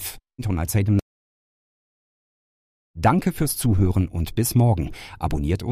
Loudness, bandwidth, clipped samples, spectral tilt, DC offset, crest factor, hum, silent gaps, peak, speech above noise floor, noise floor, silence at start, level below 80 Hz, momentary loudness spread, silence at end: -22 LUFS; 15.5 kHz; under 0.1%; -6 dB/octave; under 0.1%; 18 dB; none; 1.02-2.94 s; -6 dBFS; over 69 dB; under -90 dBFS; 0 s; -36 dBFS; 10 LU; 0 s